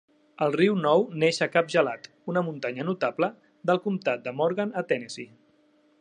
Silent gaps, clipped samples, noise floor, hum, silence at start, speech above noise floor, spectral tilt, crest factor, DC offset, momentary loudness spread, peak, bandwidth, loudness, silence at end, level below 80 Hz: none; under 0.1%; -63 dBFS; none; 0.4 s; 37 dB; -5.5 dB/octave; 20 dB; under 0.1%; 8 LU; -6 dBFS; 10.5 kHz; -26 LUFS; 0.75 s; -78 dBFS